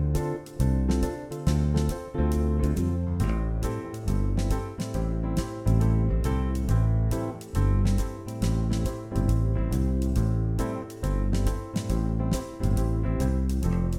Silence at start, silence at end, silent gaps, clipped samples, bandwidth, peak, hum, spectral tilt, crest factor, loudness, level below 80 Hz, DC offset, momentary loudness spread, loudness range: 0 s; 0 s; none; under 0.1%; 15.5 kHz; -10 dBFS; none; -7.5 dB/octave; 14 dB; -27 LUFS; -28 dBFS; under 0.1%; 6 LU; 2 LU